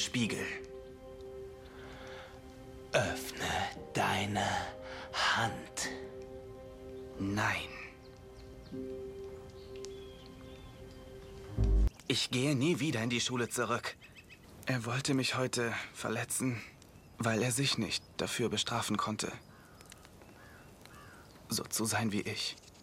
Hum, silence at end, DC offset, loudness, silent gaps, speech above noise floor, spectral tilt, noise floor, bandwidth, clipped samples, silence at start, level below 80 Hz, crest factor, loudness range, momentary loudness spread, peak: none; 0 s; under 0.1%; -34 LUFS; none; 21 dB; -4 dB/octave; -55 dBFS; 16 kHz; under 0.1%; 0 s; -46 dBFS; 22 dB; 7 LU; 21 LU; -14 dBFS